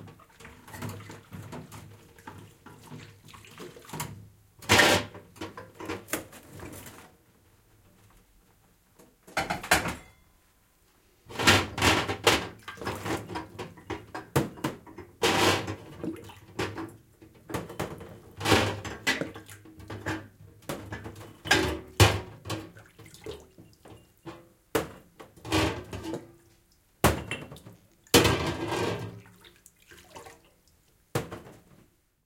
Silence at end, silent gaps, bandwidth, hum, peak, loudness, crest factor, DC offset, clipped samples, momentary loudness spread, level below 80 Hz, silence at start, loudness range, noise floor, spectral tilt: 0.7 s; none; 17 kHz; none; -4 dBFS; -28 LUFS; 28 dB; under 0.1%; under 0.1%; 25 LU; -50 dBFS; 0 s; 15 LU; -64 dBFS; -3.5 dB/octave